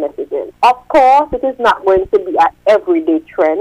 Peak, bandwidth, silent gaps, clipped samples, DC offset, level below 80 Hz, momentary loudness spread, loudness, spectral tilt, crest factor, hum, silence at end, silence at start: -2 dBFS; 13.5 kHz; none; under 0.1%; under 0.1%; -42 dBFS; 8 LU; -13 LUFS; -5 dB/octave; 10 dB; none; 0 s; 0 s